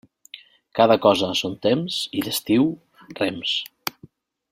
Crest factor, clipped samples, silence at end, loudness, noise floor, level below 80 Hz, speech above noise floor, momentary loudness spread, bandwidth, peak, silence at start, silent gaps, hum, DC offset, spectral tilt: 20 dB; under 0.1%; 0.6 s; -22 LUFS; -51 dBFS; -62 dBFS; 31 dB; 25 LU; 16.5 kHz; -2 dBFS; 0.35 s; none; none; under 0.1%; -4.5 dB/octave